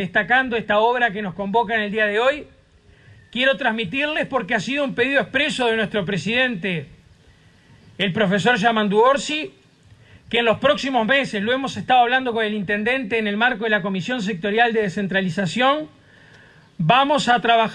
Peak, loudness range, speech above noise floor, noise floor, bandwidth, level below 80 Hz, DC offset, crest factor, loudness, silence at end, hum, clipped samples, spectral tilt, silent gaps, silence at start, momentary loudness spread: -4 dBFS; 2 LU; 32 dB; -52 dBFS; 10.5 kHz; -56 dBFS; under 0.1%; 16 dB; -20 LUFS; 0 s; none; under 0.1%; -5 dB/octave; none; 0 s; 7 LU